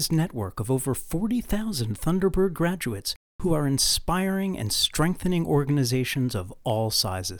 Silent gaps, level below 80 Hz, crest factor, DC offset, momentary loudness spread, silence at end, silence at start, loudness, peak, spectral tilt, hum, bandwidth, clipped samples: 3.16-3.39 s; -40 dBFS; 16 dB; under 0.1%; 7 LU; 0 s; 0 s; -25 LUFS; -8 dBFS; -4.5 dB/octave; none; over 20 kHz; under 0.1%